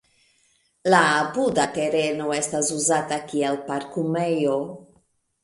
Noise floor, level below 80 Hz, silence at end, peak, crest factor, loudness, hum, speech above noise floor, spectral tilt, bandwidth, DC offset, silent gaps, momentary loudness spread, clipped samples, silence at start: -65 dBFS; -64 dBFS; 0.6 s; -2 dBFS; 20 dB; -22 LUFS; none; 42 dB; -3.5 dB/octave; 11.5 kHz; under 0.1%; none; 10 LU; under 0.1%; 0.85 s